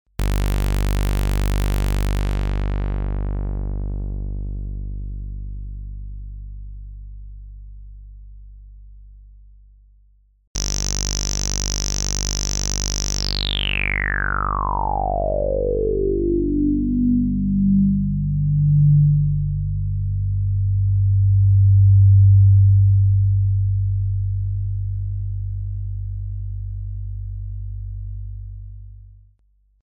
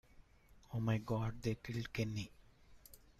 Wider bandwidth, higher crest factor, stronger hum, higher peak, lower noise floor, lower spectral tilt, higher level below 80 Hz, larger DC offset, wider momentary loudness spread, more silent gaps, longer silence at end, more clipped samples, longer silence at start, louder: first, 17.5 kHz vs 14.5 kHz; about the same, 14 dB vs 18 dB; first, 50 Hz at -30 dBFS vs none; first, -6 dBFS vs -24 dBFS; second, -60 dBFS vs -65 dBFS; about the same, -5.5 dB/octave vs -6.5 dB/octave; first, -26 dBFS vs -60 dBFS; neither; first, 19 LU vs 14 LU; first, 10.47-10.55 s vs none; first, 0.85 s vs 0.25 s; neither; about the same, 0.2 s vs 0.15 s; first, -20 LUFS vs -41 LUFS